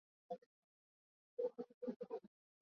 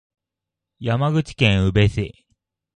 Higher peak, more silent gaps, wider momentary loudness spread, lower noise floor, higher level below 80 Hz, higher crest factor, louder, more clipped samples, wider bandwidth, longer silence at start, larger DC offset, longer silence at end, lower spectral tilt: second, -32 dBFS vs -2 dBFS; first, 0.46-1.37 s, 1.74-1.81 s, 1.96-2.00 s vs none; second, 8 LU vs 12 LU; first, under -90 dBFS vs -85 dBFS; second, under -90 dBFS vs -38 dBFS; about the same, 20 dB vs 20 dB; second, -50 LUFS vs -20 LUFS; neither; second, 6.2 kHz vs 9.6 kHz; second, 0.3 s vs 0.8 s; neither; second, 0.35 s vs 0.7 s; about the same, -7 dB/octave vs -6.5 dB/octave